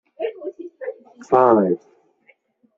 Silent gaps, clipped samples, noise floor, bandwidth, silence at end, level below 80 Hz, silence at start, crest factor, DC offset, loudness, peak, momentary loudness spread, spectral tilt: none; under 0.1%; -59 dBFS; 7.6 kHz; 1 s; -66 dBFS; 0.2 s; 20 dB; under 0.1%; -19 LUFS; -2 dBFS; 19 LU; -7.5 dB/octave